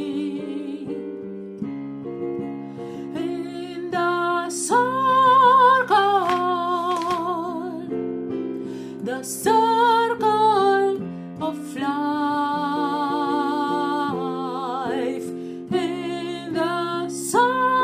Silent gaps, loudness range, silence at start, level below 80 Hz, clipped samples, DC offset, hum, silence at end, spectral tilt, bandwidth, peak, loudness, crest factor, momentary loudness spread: none; 9 LU; 0 s; -68 dBFS; under 0.1%; under 0.1%; none; 0 s; -4 dB/octave; 15.5 kHz; -6 dBFS; -22 LUFS; 16 dB; 14 LU